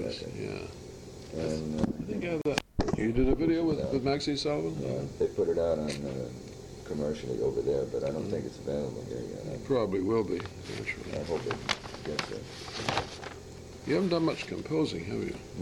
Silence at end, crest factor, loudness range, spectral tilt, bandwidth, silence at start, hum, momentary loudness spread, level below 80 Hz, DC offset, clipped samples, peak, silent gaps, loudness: 0 s; 22 dB; 4 LU; -6 dB/octave; 14.5 kHz; 0 s; none; 12 LU; -46 dBFS; under 0.1%; under 0.1%; -10 dBFS; none; -32 LUFS